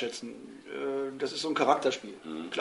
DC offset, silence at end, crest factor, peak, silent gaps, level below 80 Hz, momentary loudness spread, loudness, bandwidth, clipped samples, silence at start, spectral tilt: under 0.1%; 0 s; 22 dB; -10 dBFS; none; -74 dBFS; 16 LU; -31 LUFS; 11.5 kHz; under 0.1%; 0 s; -3.5 dB/octave